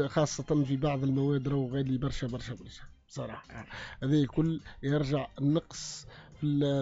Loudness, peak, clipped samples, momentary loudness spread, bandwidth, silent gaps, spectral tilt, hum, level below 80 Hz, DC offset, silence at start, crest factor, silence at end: -31 LUFS; -16 dBFS; under 0.1%; 16 LU; 8 kHz; none; -7 dB/octave; none; -50 dBFS; under 0.1%; 0 s; 16 dB; 0 s